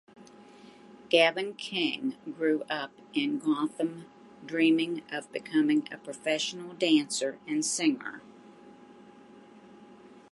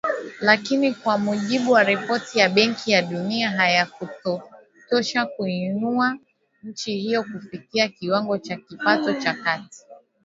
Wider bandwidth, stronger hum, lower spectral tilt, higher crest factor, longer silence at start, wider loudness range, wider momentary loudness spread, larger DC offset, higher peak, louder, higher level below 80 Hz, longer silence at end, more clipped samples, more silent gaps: first, 11.5 kHz vs 7.8 kHz; neither; second, -3 dB/octave vs -4.5 dB/octave; about the same, 22 dB vs 22 dB; first, 0.2 s vs 0.05 s; second, 3 LU vs 6 LU; about the same, 11 LU vs 11 LU; neither; second, -8 dBFS vs 0 dBFS; second, -29 LUFS vs -22 LUFS; second, -80 dBFS vs -70 dBFS; about the same, 0.15 s vs 0.25 s; neither; neither